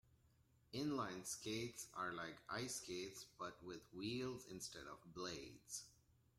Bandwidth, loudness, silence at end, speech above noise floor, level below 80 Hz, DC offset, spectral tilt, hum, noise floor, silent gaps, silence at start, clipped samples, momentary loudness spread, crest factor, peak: 16 kHz; -49 LUFS; 0.45 s; 26 dB; -76 dBFS; under 0.1%; -3.5 dB/octave; none; -76 dBFS; none; 0.1 s; under 0.1%; 8 LU; 18 dB; -32 dBFS